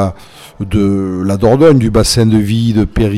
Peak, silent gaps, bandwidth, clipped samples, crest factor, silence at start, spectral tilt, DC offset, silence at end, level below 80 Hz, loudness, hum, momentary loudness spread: 0 dBFS; none; 15 kHz; 0.1%; 10 dB; 0 s; -6.5 dB/octave; under 0.1%; 0 s; -26 dBFS; -11 LUFS; none; 9 LU